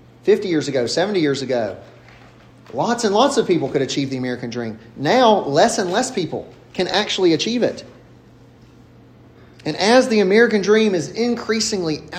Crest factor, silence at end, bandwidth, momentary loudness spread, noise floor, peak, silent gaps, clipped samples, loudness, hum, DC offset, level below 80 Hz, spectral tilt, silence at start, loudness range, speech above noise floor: 18 dB; 0 s; 14.5 kHz; 13 LU; -46 dBFS; 0 dBFS; none; under 0.1%; -18 LUFS; none; under 0.1%; -58 dBFS; -4 dB/octave; 0.25 s; 4 LU; 28 dB